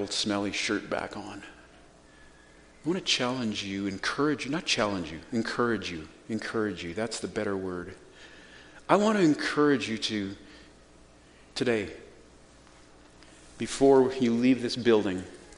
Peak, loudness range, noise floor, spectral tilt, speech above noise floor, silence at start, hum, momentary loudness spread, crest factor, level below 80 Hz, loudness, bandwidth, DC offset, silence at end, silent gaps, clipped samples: -6 dBFS; 7 LU; -55 dBFS; -4.5 dB/octave; 27 dB; 0 s; none; 17 LU; 24 dB; -58 dBFS; -28 LUFS; 10.5 kHz; under 0.1%; 0 s; none; under 0.1%